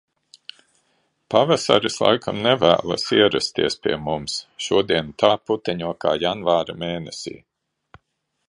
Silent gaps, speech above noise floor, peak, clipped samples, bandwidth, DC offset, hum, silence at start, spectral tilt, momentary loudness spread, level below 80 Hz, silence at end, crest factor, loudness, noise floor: none; 54 dB; 0 dBFS; under 0.1%; 11 kHz; under 0.1%; none; 1.3 s; -4 dB/octave; 12 LU; -54 dBFS; 1.1 s; 22 dB; -20 LUFS; -75 dBFS